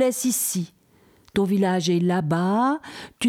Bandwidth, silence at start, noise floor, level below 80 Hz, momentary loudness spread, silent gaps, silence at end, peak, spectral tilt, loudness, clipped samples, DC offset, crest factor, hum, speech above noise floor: 17.5 kHz; 0 s; -57 dBFS; -60 dBFS; 9 LU; none; 0 s; -10 dBFS; -5 dB/octave; -23 LUFS; under 0.1%; under 0.1%; 14 dB; none; 35 dB